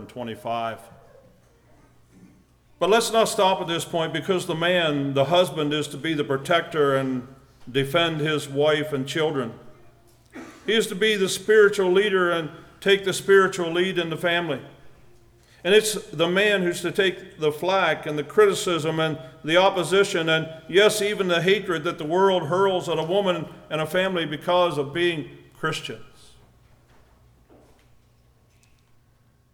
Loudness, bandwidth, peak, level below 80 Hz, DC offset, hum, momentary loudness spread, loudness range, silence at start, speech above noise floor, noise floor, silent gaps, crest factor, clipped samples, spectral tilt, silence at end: -22 LUFS; 17.5 kHz; -6 dBFS; -60 dBFS; under 0.1%; 60 Hz at -60 dBFS; 11 LU; 5 LU; 0 s; 38 dB; -60 dBFS; none; 18 dB; under 0.1%; -4 dB/octave; 3.45 s